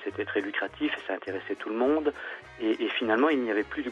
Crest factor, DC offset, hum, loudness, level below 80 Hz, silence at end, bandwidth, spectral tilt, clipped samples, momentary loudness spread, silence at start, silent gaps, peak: 18 dB; under 0.1%; none; -29 LUFS; -62 dBFS; 0 s; 7.4 kHz; -5.5 dB/octave; under 0.1%; 10 LU; 0 s; none; -10 dBFS